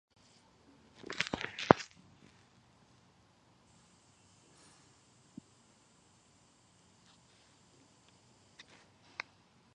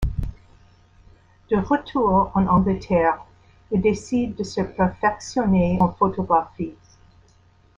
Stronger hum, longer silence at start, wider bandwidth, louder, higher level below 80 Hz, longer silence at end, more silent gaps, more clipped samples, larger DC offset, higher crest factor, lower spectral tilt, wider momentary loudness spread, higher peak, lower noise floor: neither; first, 1.05 s vs 0 s; first, 11 kHz vs 7.8 kHz; second, -34 LUFS vs -22 LUFS; second, -68 dBFS vs -38 dBFS; first, 7.9 s vs 1.05 s; neither; neither; neither; first, 42 dB vs 18 dB; second, -5 dB/octave vs -7.5 dB/octave; first, 32 LU vs 11 LU; first, 0 dBFS vs -4 dBFS; first, -67 dBFS vs -56 dBFS